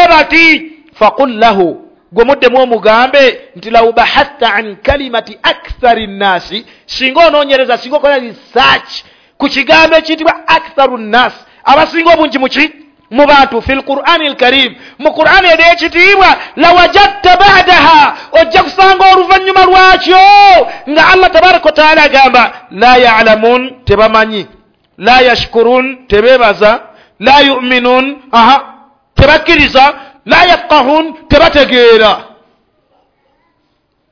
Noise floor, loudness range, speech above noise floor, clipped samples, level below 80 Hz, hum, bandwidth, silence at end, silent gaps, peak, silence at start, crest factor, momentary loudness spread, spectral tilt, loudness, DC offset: -59 dBFS; 6 LU; 52 dB; 7%; -30 dBFS; none; 5.4 kHz; 1.9 s; none; 0 dBFS; 0 s; 8 dB; 9 LU; -4.5 dB/octave; -6 LUFS; 0.6%